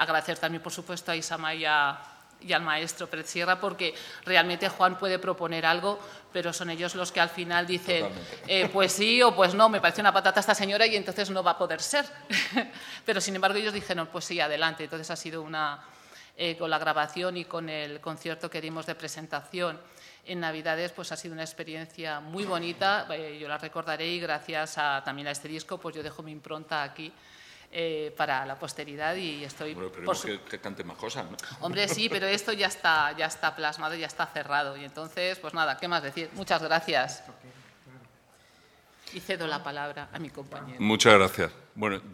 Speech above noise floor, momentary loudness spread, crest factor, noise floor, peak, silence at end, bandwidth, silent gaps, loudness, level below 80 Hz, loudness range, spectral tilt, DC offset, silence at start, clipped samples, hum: 31 dB; 15 LU; 28 dB; -60 dBFS; 0 dBFS; 0 s; 17 kHz; none; -28 LUFS; -68 dBFS; 11 LU; -3 dB/octave; under 0.1%; 0 s; under 0.1%; none